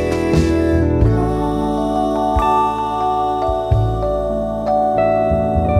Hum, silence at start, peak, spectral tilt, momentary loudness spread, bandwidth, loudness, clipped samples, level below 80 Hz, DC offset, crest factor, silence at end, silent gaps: none; 0 s; -2 dBFS; -8 dB/octave; 4 LU; 14 kHz; -17 LUFS; under 0.1%; -26 dBFS; under 0.1%; 14 dB; 0 s; none